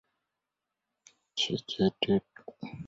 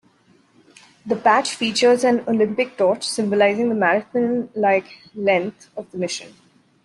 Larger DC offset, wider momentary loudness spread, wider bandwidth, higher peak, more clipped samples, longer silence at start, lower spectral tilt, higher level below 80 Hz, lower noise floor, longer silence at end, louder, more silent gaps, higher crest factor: neither; first, 17 LU vs 13 LU; second, 7.8 kHz vs 12 kHz; second, -12 dBFS vs -4 dBFS; neither; first, 1.35 s vs 1.05 s; about the same, -5 dB/octave vs -4 dB/octave; about the same, -64 dBFS vs -66 dBFS; first, -87 dBFS vs -57 dBFS; second, 0 s vs 0.55 s; second, -30 LUFS vs -19 LUFS; neither; about the same, 22 dB vs 18 dB